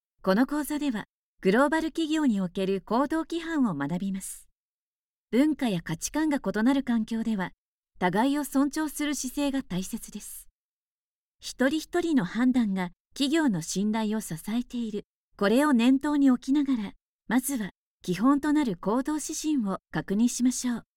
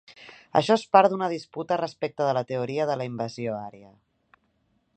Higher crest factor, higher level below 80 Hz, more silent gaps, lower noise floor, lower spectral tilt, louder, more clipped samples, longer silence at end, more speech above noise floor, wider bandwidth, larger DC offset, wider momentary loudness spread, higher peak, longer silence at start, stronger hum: second, 18 dB vs 24 dB; first, -56 dBFS vs -72 dBFS; first, 1.09-1.38 s, 4.57-5.26 s, 7.58-7.83 s, 10.51-11.39 s, 13.00-13.05 s, 15.04-15.31 s, 17.02-17.19 s, 17.77-17.98 s vs none; first, under -90 dBFS vs -70 dBFS; about the same, -5 dB/octave vs -6 dB/octave; about the same, -27 LUFS vs -25 LUFS; neither; second, 0.15 s vs 1.15 s; first, over 64 dB vs 45 dB; first, 17 kHz vs 9 kHz; neither; about the same, 12 LU vs 13 LU; second, -10 dBFS vs -2 dBFS; first, 0.25 s vs 0.1 s; neither